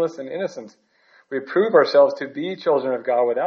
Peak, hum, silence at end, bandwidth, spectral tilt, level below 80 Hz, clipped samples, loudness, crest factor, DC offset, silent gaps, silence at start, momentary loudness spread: -2 dBFS; none; 0 s; 6.8 kHz; -3.5 dB/octave; -78 dBFS; under 0.1%; -20 LUFS; 18 dB; under 0.1%; none; 0 s; 14 LU